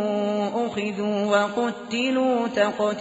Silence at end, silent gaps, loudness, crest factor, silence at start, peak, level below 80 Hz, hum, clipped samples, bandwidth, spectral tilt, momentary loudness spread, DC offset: 0 s; none; -24 LUFS; 16 dB; 0 s; -8 dBFS; -66 dBFS; none; under 0.1%; 8 kHz; -3.5 dB/octave; 5 LU; under 0.1%